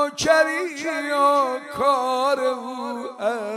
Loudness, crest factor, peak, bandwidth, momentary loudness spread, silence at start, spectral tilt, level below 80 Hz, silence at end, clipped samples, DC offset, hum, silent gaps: -21 LUFS; 16 dB; -6 dBFS; 16 kHz; 11 LU; 0 s; -3 dB/octave; -60 dBFS; 0 s; under 0.1%; under 0.1%; none; none